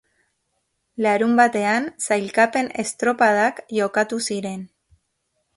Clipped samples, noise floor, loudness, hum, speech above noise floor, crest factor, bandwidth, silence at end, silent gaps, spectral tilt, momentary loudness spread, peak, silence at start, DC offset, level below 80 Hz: under 0.1%; -73 dBFS; -20 LUFS; none; 53 dB; 18 dB; 11.5 kHz; 0.9 s; none; -4 dB/octave; 9 LU; -4 dBFS; 1 s; under 0.1%; -66 dBFS